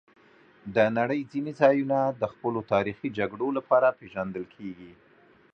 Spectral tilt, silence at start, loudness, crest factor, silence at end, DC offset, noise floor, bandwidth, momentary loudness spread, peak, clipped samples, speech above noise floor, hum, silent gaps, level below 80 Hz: -8 dB/octave; 0.65 s; -26 LUFS; 22 dB; 0.6 s; under 0.1%; -57 dBFS; 6.6 kHz; 16 LU; -6 dBFS; under 0.1%; 31 dB; none; none; -64 dBFS